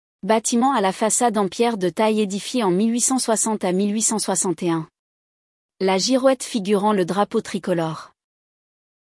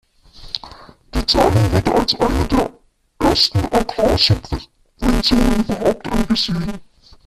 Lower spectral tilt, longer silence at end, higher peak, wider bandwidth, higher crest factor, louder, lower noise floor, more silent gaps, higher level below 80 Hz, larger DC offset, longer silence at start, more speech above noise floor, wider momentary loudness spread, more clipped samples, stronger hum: second, -4 dB/octave vs -5.5 dB/octave; first, 0.95 s vs 0.45 s; second, -4 dBFS vs 0 dBFS; second, 12 kHz vs 14.5 kHz; about the same, 16 dB vs 18 dB; second, -20 LUFS vs -17 LUFS; first, under -90 dBFS vs -40 dBFS; first, 4.99-5.69 s vs none; second, -68 dBFS vs -28 dBFS; neither; about the same, 0.25 s vs 0.35 s; first, over 70 dB vs 24 dB; second, 6 LU vs 14 LU; neither; neither